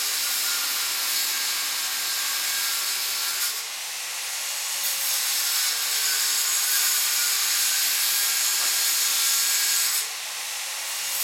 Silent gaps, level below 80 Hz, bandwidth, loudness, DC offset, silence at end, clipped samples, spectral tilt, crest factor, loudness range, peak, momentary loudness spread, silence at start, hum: none; under -90 dBFS; 16.5 kHz; -22 LUFS; under 0.1%; 0 s; under 0.1%; 4.5 dB/octave; 16 dB; 4 LU; -10 dBFS; 8 LU; 0 s; none